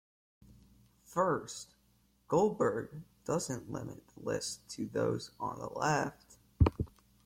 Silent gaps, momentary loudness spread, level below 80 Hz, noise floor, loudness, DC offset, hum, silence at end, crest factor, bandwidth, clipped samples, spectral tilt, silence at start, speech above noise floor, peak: none; 14 LU; -50 dBFS; -70 dBFS; -35 LUFS; under 0.1%; none; 0.35 s; 24 dB; 16.5 kHz; under 0.1%; -5.5 dB/octave; 1.1 s; 35 dB; -12 dBFS